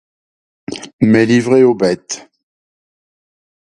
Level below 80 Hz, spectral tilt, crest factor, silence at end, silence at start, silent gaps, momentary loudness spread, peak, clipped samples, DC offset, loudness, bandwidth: -54 dBFS; -6 dB/octave; 16 dB; 1.5 s; 0.7 s; 0.93-0.99 s; 18 LU; 0 dBFS; under 0.1%; under 0.1%; -12 LUFS; 11 kHz